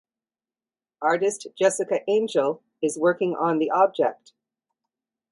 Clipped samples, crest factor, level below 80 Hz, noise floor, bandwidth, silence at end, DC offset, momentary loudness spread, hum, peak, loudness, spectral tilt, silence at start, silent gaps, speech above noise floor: under 0.1%; 18 dB; -76 dBFS; under -90 dBFS; 11.5 kHz; 1.2 s; under 0.1%; 6 LU; none; -6 dBFS; -23 LUFS; -4.5 dB/octave; 1 s; none; over 67 dB